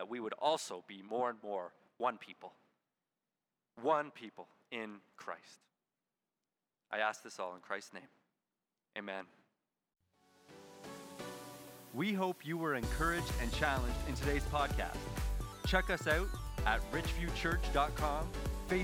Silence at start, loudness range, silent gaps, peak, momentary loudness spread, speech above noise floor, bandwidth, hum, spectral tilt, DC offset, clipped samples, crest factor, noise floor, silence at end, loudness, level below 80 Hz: 0 s; 13 LU; none; -16 dBFS; 17 LU; over 53 dB; 16.5 kHz; none; -5 dB/octave; under 0.1%; under 0.1%; 24 dB; under -90 dBFS; 0 s; -38 LUFS; -46 dBFS